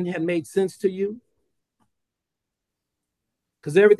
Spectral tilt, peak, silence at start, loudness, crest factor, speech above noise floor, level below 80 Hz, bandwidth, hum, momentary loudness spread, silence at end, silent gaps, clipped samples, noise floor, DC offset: -6.5 dB/octave; -4 dBFS; 0 s; -24 LUFS; 20 dB; 64 dB; -72 dBFS; 12.5 kHz; none; 13 LU; 0.05 s; none; under 0.1%; -84 dBFS; under 0.1%